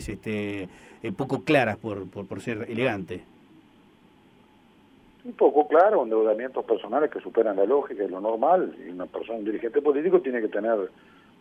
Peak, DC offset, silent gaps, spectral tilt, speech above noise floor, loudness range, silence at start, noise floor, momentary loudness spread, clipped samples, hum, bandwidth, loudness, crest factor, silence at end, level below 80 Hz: -6 dBFS; under 0.1%; none; -7 dB/octave; 32 dB; 8 LU; 0 s; -57 dBFS; 15 LU; under 0.1%; none; 11.5 kHz; -25 LUFS; 20 dB; 0.5 s; -58 dBFS